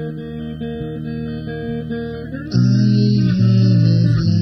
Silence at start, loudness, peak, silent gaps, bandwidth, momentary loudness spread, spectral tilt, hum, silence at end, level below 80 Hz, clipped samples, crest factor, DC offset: 0 s; -17 LUFS; -4 dBFS; none; 6.2 kHz; 14 LU; -8.5 dB/octave; none; 0 s; -40 dBFS; under 0.1%; 12 dB; under 0.1%